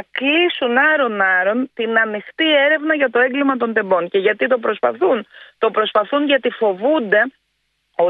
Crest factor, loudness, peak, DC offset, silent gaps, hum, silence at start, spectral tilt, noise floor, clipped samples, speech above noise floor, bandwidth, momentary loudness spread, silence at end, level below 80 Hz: 16 dB; -16 LUFS; -2 dBFS; under 0.1%; none; none; 0.15 s; -7 dB/octave; -69 dBFS; under 0.1%; 52 dB; 4.6 kHz; 5 LU; 0 s; -70 dBFS